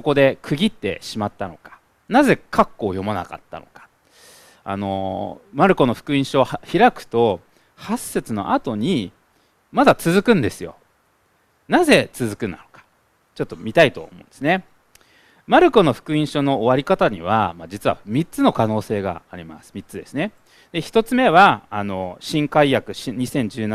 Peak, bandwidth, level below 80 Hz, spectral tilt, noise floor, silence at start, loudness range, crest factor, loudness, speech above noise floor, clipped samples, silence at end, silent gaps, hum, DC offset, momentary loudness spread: 0 dBFS; 15 kHz; -50 dBFS; -5.5 dB/octave; -62 dBFS; 0.05 s; 5 LU; 20 dB; -19 LUFS; 43 dB; under 0.1%; 0 s; none; none; under 0.1%; 15 LU